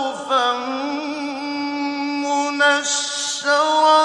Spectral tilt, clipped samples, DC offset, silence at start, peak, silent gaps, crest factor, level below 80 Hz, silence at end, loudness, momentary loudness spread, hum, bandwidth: 0 dB/octave; under 0.1%; under 0.1%; 0 s; -4 dBFS; none; 16 dB; -72 dBFS; 0 s; -20 LUFS; 9 LU; none; 11.5 kHz